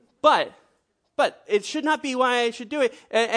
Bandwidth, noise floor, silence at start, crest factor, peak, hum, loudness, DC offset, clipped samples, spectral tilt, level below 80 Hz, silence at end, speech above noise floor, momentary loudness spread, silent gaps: 10.5 kHz; -70 dBFS; 0.25 s; 20 dB; -4 dBFS; none; -23 LUFS; under 0.1%; under 0.1%; -2.5 dB/octave; -74 dBFS; 0 s; 47 dB; 6 LU; none